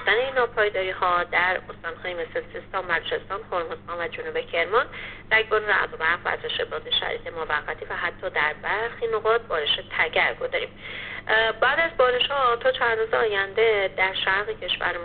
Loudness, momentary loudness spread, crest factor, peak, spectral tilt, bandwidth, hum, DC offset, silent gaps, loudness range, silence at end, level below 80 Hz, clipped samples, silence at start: -24 LUFS; 10 LU; 18 dB; -6 dBFS; 0.5 dB/octave; 4.7 kHz; none; under 0.1%; none; 5 LU; 0 s; -48 dBFS; under 0.1%; 0 s